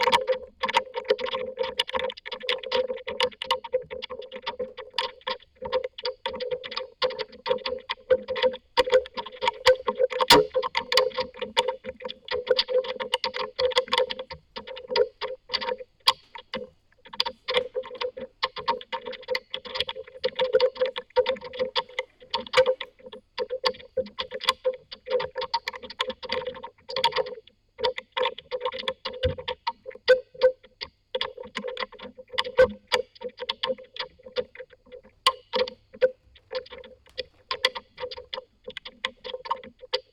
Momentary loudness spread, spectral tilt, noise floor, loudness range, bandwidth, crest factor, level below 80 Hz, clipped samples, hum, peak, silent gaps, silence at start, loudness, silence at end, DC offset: 15 LU; -2.5 dB/octave; -51 dBFS; 7 LU; 17.5 kHz; 28 dB; -56 dBFS; under 0.1%; none; 0 dBFS; none; 0 s; -27 LUFS; 0.1 s; under 0.1%